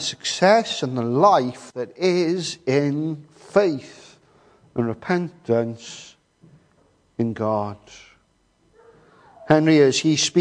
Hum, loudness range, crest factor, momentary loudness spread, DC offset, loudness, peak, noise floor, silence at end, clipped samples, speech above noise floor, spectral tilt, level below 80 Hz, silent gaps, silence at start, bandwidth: none; 10 LU; 20 dB; 16 LU; under 0.1%; -21 LUFS; -2 dBFS; -63 dBFS; 0 s; under 0.1%; 42 dB; -5 dB/octave; -64 dBFS; none; 0 s; 10.5 kHz